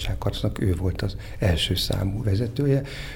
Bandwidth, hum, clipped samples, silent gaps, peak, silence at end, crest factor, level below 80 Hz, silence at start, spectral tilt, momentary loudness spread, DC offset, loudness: 17.5 kHz; none; under 0.1%; none; -10 dBFS; 0 s; 14 dB; -34 dBFS; 0 s; -6 dB/octave; 5 LU; under 0.1%; -25 LUFS